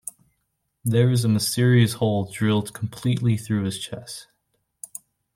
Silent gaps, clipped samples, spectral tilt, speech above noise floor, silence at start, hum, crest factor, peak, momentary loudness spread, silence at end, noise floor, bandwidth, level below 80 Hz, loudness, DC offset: none; under 0.1%; -6 dB/octave; 53 dB; 0.05 s; none; 18 dB; -6 dBFS; 19 LU; 1.15 s; -75 dBFS; 16.5 kHz; -58 dBFS; -22 LUFS; under 0.1%